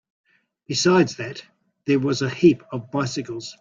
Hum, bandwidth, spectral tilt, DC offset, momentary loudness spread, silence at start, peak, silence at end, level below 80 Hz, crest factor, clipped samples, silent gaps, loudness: none; 7.6 kHz; -5 dB/octave; under 0.1%; 15 LU; 0.7 s; -4 dBFS; 0.1 s; -60 dBFS; 20 dB; under 0.1%; none; -21 LUFS